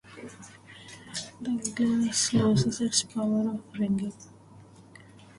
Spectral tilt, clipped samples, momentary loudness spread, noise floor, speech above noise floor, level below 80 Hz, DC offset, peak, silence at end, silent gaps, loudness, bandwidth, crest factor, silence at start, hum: -4.5 dB/octave; under 0.1%; 22 LU; -52 dBFS; 25 dB; -60 dBFS; under 0.1%; -10 dBFS; 0.35 s; none; -27 LUFS; 11.5 kHz; 20 dB; 0.05 s; none